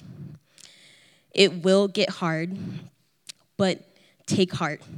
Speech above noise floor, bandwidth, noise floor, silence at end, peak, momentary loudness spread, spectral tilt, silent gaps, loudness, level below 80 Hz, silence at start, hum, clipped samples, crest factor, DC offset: 33 dB; 12.5 kHz; -56 dBFS; 0 s; -4 dBFS; 23 LU; -5 dB/octave; none; -24 LUFS; -70 dBFS; 0.05 s; none; under 0.1%; 24 dB; under 0.1%